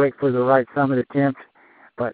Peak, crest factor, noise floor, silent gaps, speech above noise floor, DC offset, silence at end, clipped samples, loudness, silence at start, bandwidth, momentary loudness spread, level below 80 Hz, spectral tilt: -2 dBFS; 18 dB; -52 dBFS; none; 33 dB; under 0.1%; 0 s; under 0.1%; -20 LUFS; 0 s; 4.6 kHz; 9 LU; -64 dBFS; -7 dB/octave